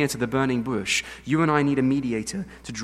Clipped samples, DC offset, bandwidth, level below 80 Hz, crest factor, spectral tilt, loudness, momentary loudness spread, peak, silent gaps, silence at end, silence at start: under 0.1%; under 0.1%; 15 kHz; -52 dBFS; 18 dB; -5 dB/octave; -24 LUFS; 10 LU; -6 dBFS; none; 0 s; 0 s